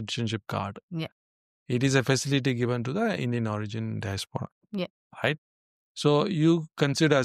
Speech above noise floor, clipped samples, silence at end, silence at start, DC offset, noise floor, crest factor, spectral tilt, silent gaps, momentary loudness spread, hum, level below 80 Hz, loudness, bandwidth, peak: over 63 dB; under 0.1%; 0 s; 0 s; under 0.1%; under -90 dBFS; 18 dB; -5.5 dB/octave; 0.83-0.89 s, 1.12-1.66 s, 4.52-4.61 s, 4.90-5.10 s, 5.38-5.95 s; 12 LU; none; -66 dBFS; -28 LUFS; 14.5 kHz; -8 dBFS